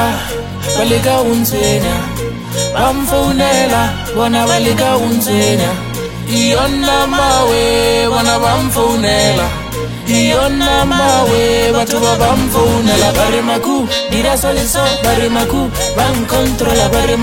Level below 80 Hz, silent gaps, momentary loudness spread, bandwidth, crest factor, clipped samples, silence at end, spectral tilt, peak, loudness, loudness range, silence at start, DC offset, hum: -26 dBFS; none; 6 LU; 16.5 kHz; 12 dB; under 0.1%; 0 s; -4 dB/octave; 0 dBFS; -12 LUFS; 2 LU; 0 s; under 0.1%; none